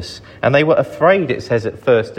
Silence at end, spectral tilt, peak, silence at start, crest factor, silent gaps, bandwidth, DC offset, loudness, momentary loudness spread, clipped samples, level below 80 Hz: 0 s; -6.5 dB/octave; 0 dBFS; 0 s; 14 dB; none; 10 kHz; under 0.1%; -15 LUFS; 7 LU; under 0.1%; -50 dBFS